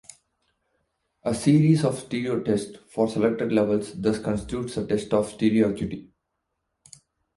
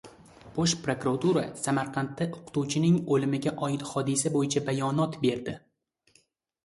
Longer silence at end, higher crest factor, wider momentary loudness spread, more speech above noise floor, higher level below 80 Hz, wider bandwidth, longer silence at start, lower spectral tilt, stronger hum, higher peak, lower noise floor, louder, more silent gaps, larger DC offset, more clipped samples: first, 1.35 s vs 1.1 s; about the same, 18 dB vs 16 dB; first, 10 LU vs 7 LU; first, 56 dB vs 40 dB; first, -52 dBFS vs -62 dBFS; about the same, 11.5 kHz vs 11.5 kHz; first, 1.25 s vs 0.05 s; first, -7 dB/octave vs -5 dB/octave; neither; first, -8 dBFS vs -12 dBFS; first, -79 dBFS vs -67 dBFS; first, -24 LUFS vs -28 LUFS; neither; neither; neither